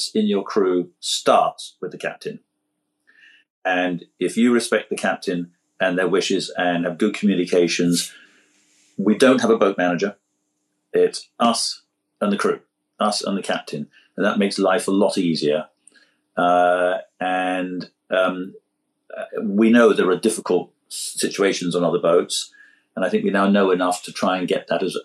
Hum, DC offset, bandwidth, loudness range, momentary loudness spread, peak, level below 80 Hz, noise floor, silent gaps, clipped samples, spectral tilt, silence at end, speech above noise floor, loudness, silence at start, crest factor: none; under 0.1%; 13 kHz; 4 LU; 13 LU; -2 dBFS; -78 dBFS; -75 dBFS; 3.50-3.62 s; under 0.1%; -4.5 dB/octave; 0 s; 55 dB; -20 LUFS; 0 s; 20 dB